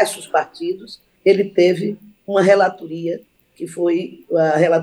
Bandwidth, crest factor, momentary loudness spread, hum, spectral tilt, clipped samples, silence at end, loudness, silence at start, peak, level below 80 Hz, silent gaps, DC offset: 12.5 kHz; 16 dB; 16 LU; none; -5.5 dB/octave; under 0.1%; 0 s; -18 LUFS; 0 s; -2 dBFS; -70 dBFS; none; under 0.1%